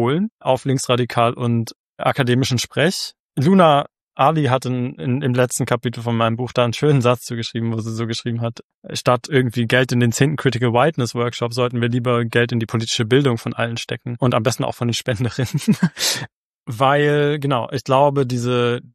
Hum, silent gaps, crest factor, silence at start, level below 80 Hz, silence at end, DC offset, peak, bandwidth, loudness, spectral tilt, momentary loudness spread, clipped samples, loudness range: none; 0.32-0.38 s, 1.76-1.97 s, 3.20-3.30 s, 4.03-4.09 s, 8.64-8.82 s, 16.34-16.64 s; 18 dB; 0 s; -56 dBFS; 0.15 s; under 0.1%; -2 dBFS; 14 kHz; -19 LUFS; -5.5 dB/octave; 8 LU; under 0.1%; 2 LU